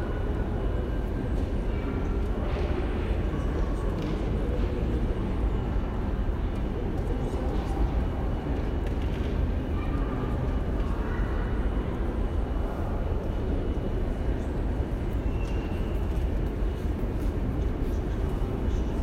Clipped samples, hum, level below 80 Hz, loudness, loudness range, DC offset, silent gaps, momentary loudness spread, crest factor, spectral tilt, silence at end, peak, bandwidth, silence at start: under 0.1%; none; -30 dBFS; -30 LUFS; 1 LU; under 0.1%; none; 2 LU; 12 dB; -8.5 dB/octave; 0 s; -14 dBFS; 9 kHz; 0 s